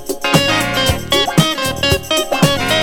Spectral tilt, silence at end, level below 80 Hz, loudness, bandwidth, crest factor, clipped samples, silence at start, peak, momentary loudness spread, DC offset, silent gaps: -3.5 dB/octave; 0 s; -32 dBFS; -14 LUFS; over 20 kHz; 14 dB; under 0.1%; 0 s; 0 dBFS; 3 LU; under 0.1%; none